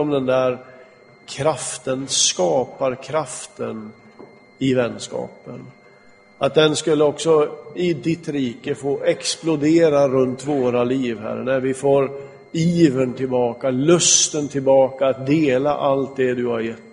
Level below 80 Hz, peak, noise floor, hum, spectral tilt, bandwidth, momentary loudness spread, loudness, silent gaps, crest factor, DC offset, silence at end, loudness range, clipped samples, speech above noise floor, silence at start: -58 dBFS; -2 dBFS; -49 dBFS; none; -4 dB/octave; 10.5 kHz; 13 LU; -19 LUFS; none; 18 dB; under 0.1%; 0.1 s; 6 LU; under 0.1%; 30 dB; 0 s